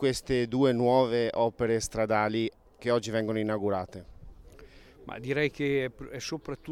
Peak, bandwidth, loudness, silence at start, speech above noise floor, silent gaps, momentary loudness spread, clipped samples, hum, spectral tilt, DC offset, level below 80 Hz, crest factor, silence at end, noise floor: -12 dBFS; 15.5 kHz; -29 LUFS; 0 s; 24 dB; none; 13 LU; under 0.1%; none; -5.5 dB/octave; under 0.1%; -54 dBFS; 18 dB; 0 s; -52 dBFS